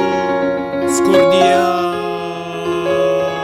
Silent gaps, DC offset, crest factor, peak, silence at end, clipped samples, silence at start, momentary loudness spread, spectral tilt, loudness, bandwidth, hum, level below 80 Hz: none; under 0.1%; 14 dB; 0 dBFS; 0 s; under 0.1%; 0 s; 11 LU; -4.5 dB/octave; -15 LUFS; 16 kHz; none; -50 dBFS